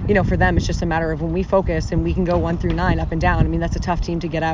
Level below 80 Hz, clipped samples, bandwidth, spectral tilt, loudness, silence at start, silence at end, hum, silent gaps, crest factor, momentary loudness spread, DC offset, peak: -26 dBFS; under 0.1%; 7.6 kHz; -7 dB/octave; -20 LUFS; 0 s; 0 s; none; none; 18 dB; 5 LU; under 0.1%; -2 dBFS